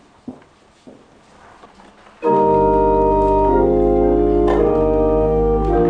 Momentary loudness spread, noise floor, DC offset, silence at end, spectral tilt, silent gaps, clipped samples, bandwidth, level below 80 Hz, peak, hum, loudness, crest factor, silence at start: 2 LU; -49 dBFS; under 0.1%; 0 s; -10 dB/octave; none; under 0.1%; 7.2 kHz; -28 dBFS; -4 dBFS; none; -15 LUFS; 12 dB; 0.3 s